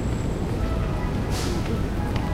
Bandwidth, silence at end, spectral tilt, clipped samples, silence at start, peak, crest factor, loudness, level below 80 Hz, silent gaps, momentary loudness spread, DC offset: 16 kHz; 0 s; -6.5 dB/octave; under 0.1%; 0 s; -10 dBFS; 14 dB; -27 LUFS; -30 dBFS; none; 1 LU; under 0.1%